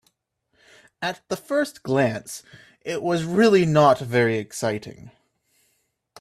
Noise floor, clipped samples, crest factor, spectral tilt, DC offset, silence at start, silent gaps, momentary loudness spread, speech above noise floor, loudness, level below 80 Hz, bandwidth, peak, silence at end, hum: -72 dBFS; under 0.1%; 20 dB; -5.5 dB/octave; under 0.1%; 1 s; none; 16 LU; 50 dB; -22 LUFS; -62 dBFS; 14.5 kHz; -4 dBFS; 1.15 s; none